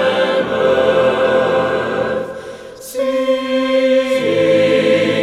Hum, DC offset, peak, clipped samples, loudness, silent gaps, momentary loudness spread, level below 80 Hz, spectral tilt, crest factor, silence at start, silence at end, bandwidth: none; under 0.1%; -2 dBFS; under 0.1%; -15 LUFS; none; 11 LU; -52 dBFS; -5 dB/octave; 12 dB; 0 s; 0 s; 14 kHz